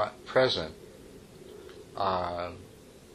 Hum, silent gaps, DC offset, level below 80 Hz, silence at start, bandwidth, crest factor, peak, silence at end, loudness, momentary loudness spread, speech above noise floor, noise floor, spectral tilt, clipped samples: none; none; under 0.1%; -60 dBFS; 0 s; 14 kHz; 22 dB; -12 dBFS; 0.05 s; -30 LUFS; 24 LU; 20 dB; -50 dBFS; -5 dB/octave; under 0.1%